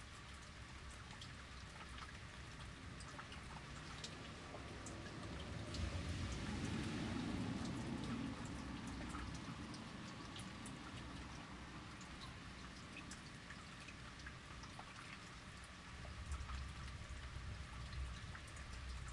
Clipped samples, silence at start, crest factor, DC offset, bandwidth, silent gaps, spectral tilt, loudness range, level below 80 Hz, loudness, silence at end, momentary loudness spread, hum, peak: under 0.1%; 0 s; 18 dB; under 0.1%; 11.5 kHz; none; -4.5 dB/octave; 8 LU; -56 dBFS; -50 LUFS; 0 s; 9 LU; none; -32 dBFS